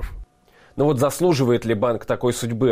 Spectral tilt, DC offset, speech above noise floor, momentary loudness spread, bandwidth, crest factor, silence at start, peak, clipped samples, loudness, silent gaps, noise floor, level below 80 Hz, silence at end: -6 dB/octave; under 0.1%; 35 dB; 4 LU; 16 kHz; 14 dB; 0 s; -8 dBFS; under 0.1%; -20 LUFS; none; -54 dBFS; -40 dBFS; 0 s